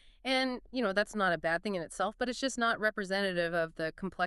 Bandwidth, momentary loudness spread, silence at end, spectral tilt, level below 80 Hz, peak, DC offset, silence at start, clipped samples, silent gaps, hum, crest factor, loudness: 11.5 kHz; 6 LU; 0 s; -4 dB/octave; -60 dBFS; -16 dBFS; under 0.1%; 0.25 s; under 0.1%; none; none; 16 dB; -32 LUFS